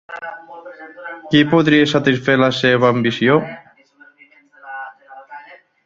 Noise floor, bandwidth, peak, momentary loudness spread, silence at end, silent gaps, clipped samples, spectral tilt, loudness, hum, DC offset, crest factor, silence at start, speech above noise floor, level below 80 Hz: -50 dBFS; 7.6 kHz; -2 dBFS; 24 LU; 0.3 s; none; under 0.1%; -6 dB/octave; -14 LUFS; none; under 0.1%; 16 dB; 0.1 s; 34 dB; -58 dBFS